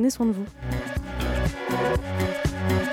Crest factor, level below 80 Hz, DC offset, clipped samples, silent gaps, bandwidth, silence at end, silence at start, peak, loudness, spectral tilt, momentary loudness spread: 14 dB; -34 dBFS; under 0.1%; under 0.1%; none; 17 kHz; 0 s; 0 s; -12 dBFS; -27 LUFS; -6 dB/octave; 6 LU